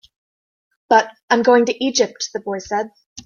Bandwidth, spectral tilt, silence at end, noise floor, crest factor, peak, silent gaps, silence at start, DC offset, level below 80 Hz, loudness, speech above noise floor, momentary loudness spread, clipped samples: 7.2 kHz; -2.5 dB/octave; 0.05 s; under -90 dBFS; 18 dB; -2 dBFS; 1.23-1.28 s, 3.06-3.16 s; 0.9 s; under 0.1%; -62 dBFS; -18 LUFS; over 73 dB; 11 LU; under 0.1%